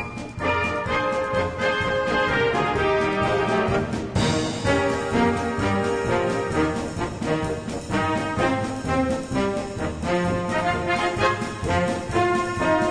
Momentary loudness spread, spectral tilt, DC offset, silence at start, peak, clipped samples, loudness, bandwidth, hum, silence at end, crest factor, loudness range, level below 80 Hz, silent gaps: 5 LU; -5.5 dB/octave; under 0.1%; 0 s; -8 dBFS; under 0.1%; -23 LUFS; 10.5 kHz; none; 0 s; 16 dB; 3 LU; -40 dBFS; none